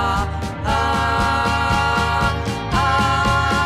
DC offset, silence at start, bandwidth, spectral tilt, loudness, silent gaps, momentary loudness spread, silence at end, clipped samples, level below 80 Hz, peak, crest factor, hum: under 0.1%; 0 s; 14.5 kHz; -5 dB/octave; -18 LUFS; none; 5 LU; 0 s; under 0.1%; -28 dBFS; -4 dBFS; 14 dB; none